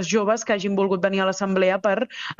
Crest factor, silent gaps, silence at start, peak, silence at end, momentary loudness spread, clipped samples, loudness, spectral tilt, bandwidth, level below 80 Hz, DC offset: 16 dB; none; 0 s; -6 dBFS; 0.05 s; 3 LU; under 0.1%; -22 LUFS; -4.5 dB/octave; 7.8 kHz; -64 dBFS; under 0.1%